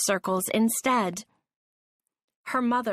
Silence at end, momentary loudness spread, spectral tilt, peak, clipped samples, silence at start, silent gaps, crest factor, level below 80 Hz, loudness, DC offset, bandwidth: 0 s; 11 LU; -3.5 dB/octave; -12 dBFS; under 0.1%; 0 s; 1.56-2.00 s, 2.24-2.28 s, 2.36-2.43 s; 16 dB; -70 dBFS; -26 LUFS; under 0.1%; 15.5 kHz